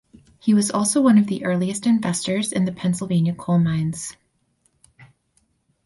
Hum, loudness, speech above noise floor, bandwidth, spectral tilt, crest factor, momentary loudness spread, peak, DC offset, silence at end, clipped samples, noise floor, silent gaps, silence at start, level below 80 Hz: none; -20 LUFS; 47 dB; 11.5 kHz; -5.5 dB/octave; 16 dB; 8 LU; -6 dBFS; under 0.1%; 0.8 s; under 0.1%; -66 dBFS; none; 0.45 s; -58 dBFS